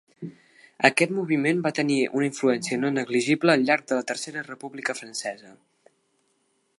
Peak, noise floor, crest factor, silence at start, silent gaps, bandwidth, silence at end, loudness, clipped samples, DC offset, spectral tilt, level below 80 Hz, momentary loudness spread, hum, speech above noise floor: -2 dBFS; -70 dBFS; 24 dB; 0.2 s; none; 11.5 kHz; 1.25 s; -24 LUFS; under 0.1%; under 0.1%; -4.5 dB/octave; -78 dBFS; 15 LU; none; 46 dB